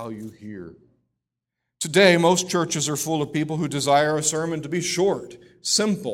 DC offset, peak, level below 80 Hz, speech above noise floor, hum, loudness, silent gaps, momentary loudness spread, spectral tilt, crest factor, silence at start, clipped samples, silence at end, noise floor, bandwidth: under 0.1%; -2 dBFS; -62 dBFS; 61 dB; none; -21 LUFS; none; 19 LU; -3.5 dB/octave; 20 dB; 0 s; under 0.1%; 0 s; -83 dBFS; 16.5 kHz